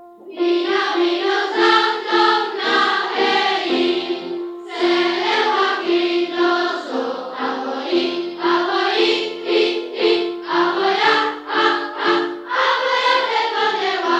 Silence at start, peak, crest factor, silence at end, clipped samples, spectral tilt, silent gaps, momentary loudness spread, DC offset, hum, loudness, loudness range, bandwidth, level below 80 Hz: 0 s; -2 dBFS; 16 dB; 0 s; under 0.1%; -3 dB/octave; none; 7 LU; under 0.1%; none; -18 LUFS; 3 LU; 8.6 kHz; -74 dBFS